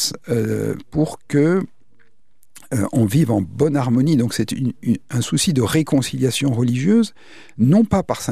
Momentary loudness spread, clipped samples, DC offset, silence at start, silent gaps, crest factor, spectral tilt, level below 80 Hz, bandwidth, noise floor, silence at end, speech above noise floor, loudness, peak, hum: 7 LU; under 0.1%; 0.8%; 0 s; none; 16 dB; -6 dB/octave; -48 dBFS; 15.5 kHz; -63 dBFS; 0 s; 45 dB; -19 LUFS; -4 dBFS; none